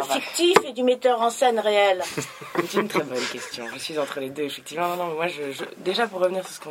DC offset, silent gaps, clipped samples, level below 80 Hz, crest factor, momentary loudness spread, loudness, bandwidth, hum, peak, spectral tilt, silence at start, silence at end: under 0.1%; none; under 0.1%; -70 dBFS; 24 dB; 11 LU; -24 LUFS; 16.5 kHz; none; 0 dBFS; -3 dB/octave; 0 s; 0 s